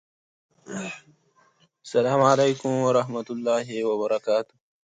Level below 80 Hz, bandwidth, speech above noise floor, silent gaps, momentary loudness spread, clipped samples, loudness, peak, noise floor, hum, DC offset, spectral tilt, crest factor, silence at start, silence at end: -72 dBFS; 9.4 kHz; 40 dB; none; 16 LU; under 0.1%; -24 LUFS; -6 dBFS; -62 dBFS; none; under 0.1%; -5.5 dB/octave; 20 dB; 0.7 s; 0.45 s